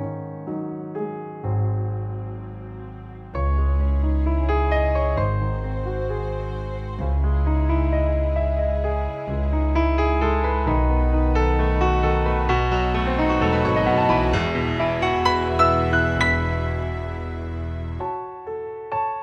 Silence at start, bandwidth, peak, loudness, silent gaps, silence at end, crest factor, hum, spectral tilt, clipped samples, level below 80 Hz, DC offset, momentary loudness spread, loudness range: 0 s; 7.2 kHz; -4 dBFS; -22 LUFS; none; 0 s; 16 dB; none; -7.5 dB/octave; under 0.1%; -26 dBFS; under 0.1%; 12 LU; 5 LU